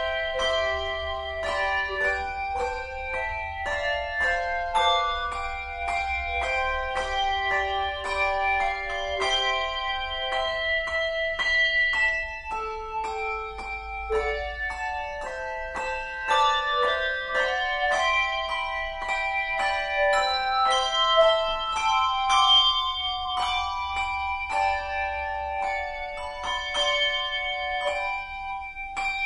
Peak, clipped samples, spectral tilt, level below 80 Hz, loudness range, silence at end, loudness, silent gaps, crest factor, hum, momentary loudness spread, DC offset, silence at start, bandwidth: -8 dBFS; under 0.1%; -1.5 dB/octave; -44 dBFS; 6 LU; 0 s; -25 LUFS; none; 18 dB; none; 10 LU; under 0.1%; 0 s; 10.5 kHz